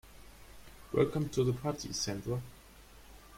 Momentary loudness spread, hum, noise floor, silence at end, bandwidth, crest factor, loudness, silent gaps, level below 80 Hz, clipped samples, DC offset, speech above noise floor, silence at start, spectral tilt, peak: 24 LU; none; -56 dBFS; 0 s; 16.5 kHz; 22 dB; -34 LUFS; none; -56 dBFS; under 0.1%; under 0.1%; 23 dB; 0.05 s; -5.5 dB/octave; -14 dBFS